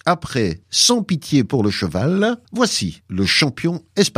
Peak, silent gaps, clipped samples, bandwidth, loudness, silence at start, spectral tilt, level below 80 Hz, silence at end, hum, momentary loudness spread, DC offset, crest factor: -2 dBFS; none; under 0.1%; 15.5 kHz; -18 LUFS; 0.05 s; -4 dB/octave; -48 dBFS; 0.05 s; none; 8 LU; under 0.1%; 18 dB